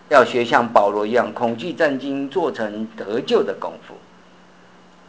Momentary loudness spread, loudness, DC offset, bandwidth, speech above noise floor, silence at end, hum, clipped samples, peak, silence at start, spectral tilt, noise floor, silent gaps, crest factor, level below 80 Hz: 12 LU; -20 LUFS; 0.2%; 8 kHz; 29 dB; 1.1 s; none; under 0.1%; 0 dBFS; 0.1 s; -5 dB/octave; -49 dBFS; none; 20 dB; -62 dBFS